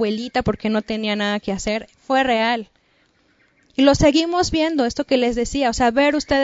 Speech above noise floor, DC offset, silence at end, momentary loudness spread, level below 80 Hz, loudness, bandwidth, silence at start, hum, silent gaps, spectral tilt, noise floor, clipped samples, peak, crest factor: 42 dB; under 0.1%; 0 s; 8 LU; -40 dBFS; -19 LUFS; 8 kHz; 0 s; none; none; -4.5 dB/octave; -61 dBFS; under 0.1%; -2 dBFS; 18 dB